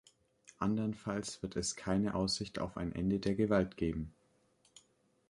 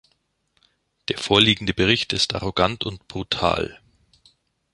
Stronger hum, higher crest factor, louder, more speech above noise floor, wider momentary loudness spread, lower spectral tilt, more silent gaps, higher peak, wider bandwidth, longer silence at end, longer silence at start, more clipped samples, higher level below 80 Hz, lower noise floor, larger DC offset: neither; about the same, 20 dB vs 24 dB; second, -36 LUFS vs -21 LUFS; second, 38 dB vs 48 dB; second, 8 LU vs 14 LU; about the same, -5 dB/octave vs -4 dB/octave; neither; second, -18 dBFS vs -2 dBFS; about the same, 11.5 kHz vs 11.5 kHz; first, 1.2 s vs 1 s; second, 0.6 s vs 1.1 s; neither; second, -56 dBFS vs -46 dBFS; first, -73 dBFS vs -69 dBFS; neither